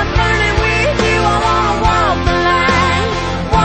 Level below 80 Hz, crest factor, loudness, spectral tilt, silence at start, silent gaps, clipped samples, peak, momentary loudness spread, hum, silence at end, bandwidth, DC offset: -22 dBFS; 12 dB; -13 LUFS; -5 dB/octave; 0 s; none; under 0.1%; 0 dBFS; 4 LU; none; 0 s; 8.8 kHz; 0.4%